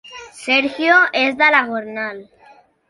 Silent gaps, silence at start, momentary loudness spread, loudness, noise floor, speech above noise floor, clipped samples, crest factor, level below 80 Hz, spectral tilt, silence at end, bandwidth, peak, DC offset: none; 0.05 s; 15 LU; -15 LUFS; -49 dBFS; 33 dB; under 0.1%; 18 dB; -64 dBFS; -2.5 dB/octave; 0.65 s; 11.5 kHz; 0 dBFS; under 0.1%